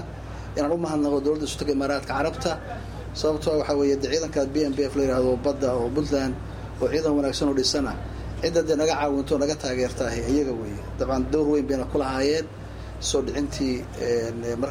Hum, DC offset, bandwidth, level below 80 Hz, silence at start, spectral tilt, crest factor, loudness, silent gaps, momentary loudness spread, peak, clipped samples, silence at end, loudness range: none; under 0.1%; 15.5 kHz; -40 dBFS; 0 s; -5 dB/octave; 16 dB; -25 LUFS; none; 10 LU; -10 dBFS; under 0.1%; 0 s; 2 LU